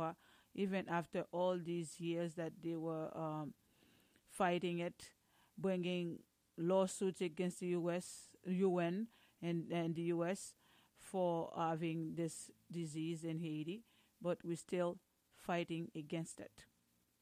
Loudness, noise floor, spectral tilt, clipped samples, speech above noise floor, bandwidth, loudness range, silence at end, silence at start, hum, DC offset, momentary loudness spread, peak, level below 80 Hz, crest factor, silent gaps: -42 LUFS; -79 dBFS; -6 dB/octave; under 0.1%; 38 dB; 15.5 kHz; 4 LU; 0.6 s; 0 s; none; under 0.1%; 14 LU; -24 dBFS; -82 dBFS; 18 dB; none